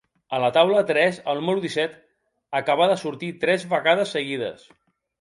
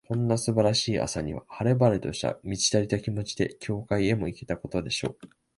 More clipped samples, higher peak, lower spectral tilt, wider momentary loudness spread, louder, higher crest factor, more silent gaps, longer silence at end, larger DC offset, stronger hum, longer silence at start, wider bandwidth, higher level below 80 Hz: neither; first, -4 dBFS vs -8 dBFS; about the same, -5 dB/octave vs -5 dB/octave; about the same, 11 LU vs 9 LU; first, -22 LUFS vs -27 LUFS; about the same, 20 dB vs 20 dB; neither; first, 0.65 s vs 0.3 s; neither; neither; first, 0.3 s vs 0.1 s; about the same, 11.5 kHz vs 11.5 kHz; second, -70 dBFS vs -50 dBFS